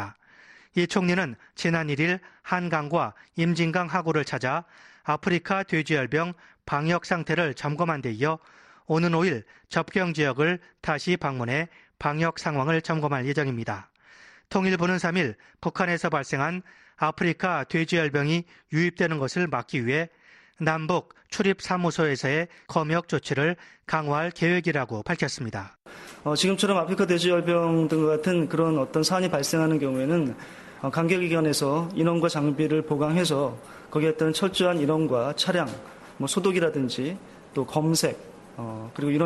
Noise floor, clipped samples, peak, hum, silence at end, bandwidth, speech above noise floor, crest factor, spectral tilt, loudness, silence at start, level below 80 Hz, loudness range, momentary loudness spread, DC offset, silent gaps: -54 dBFS; under 0.1%; -8 dBFS; none; 0 s; 12.5 kHz; 28 dB; 18 dB; -5.5 dB/octave; -26 LUFS; 0 s; -62 dBFS; 3 LU; 10 LU; under 0.1%; none